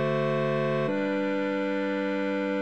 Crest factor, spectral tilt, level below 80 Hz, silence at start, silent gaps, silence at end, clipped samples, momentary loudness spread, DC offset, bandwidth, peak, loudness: 12 dB; -7.5 dB/octave; -78 dBFS; 0 s; none; 0 s; under 0.1%; 2 LU; 0.2%; 8.4 kHz; -16 dBFS; -27 LUFS